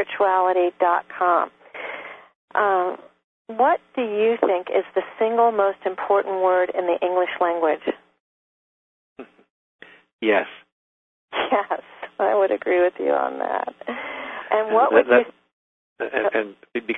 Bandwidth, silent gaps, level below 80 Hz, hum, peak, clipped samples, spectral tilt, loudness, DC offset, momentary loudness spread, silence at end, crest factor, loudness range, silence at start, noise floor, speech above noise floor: 4 kHz; 2.35-2.48 s, 3.24-3.45 s, 8.20-9.16 s, 9.50-9.79 s, 10.13-10.19 s, 10.72-11.28 s, 15.53-15.96 s; -68 dBFS; none; 0 dBFS; under 0.1%; -6.5 dB/octave; -21 LUFS; under 0.1%; 13 LU; 0 s; 22 dB; 6 LU; 0 s; under -90 dBFS; over 69 dB